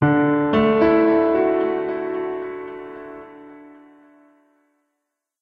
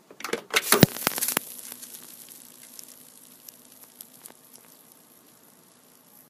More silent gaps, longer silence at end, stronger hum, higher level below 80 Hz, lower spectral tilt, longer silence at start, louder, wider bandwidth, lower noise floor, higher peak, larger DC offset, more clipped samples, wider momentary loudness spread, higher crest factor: neither; second, 1.75 s vs 2 s; neither; first, -52 dBFS vs -60 dBFS; first, -9.5 dB/octave vs -3.5 dB/octave; second, 0 s vs 0.2 s; first, -19 LUFS vs -24 LUFS; second, 5.4 kHz vs 15.5 kHz; first, -79 dBFS vs -56 dBFS; second, -4 dBFS vs 0 dBFS; neither; neither; second, 21 LU vs 28 LU; second, 16 dB vs 30 dB